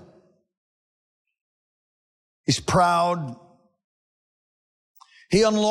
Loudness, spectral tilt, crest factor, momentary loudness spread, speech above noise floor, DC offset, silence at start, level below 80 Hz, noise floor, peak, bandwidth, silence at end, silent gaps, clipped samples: -22 LUFS; -5 dB/octave; 18 dB; 12 LU; 37 dB; under 0.1%; 2.5 s; -56 dBFS; -58 dBFS; -10 dBFS; 16 kHz; 0 s; 3.84-4.95 s; under 0.1%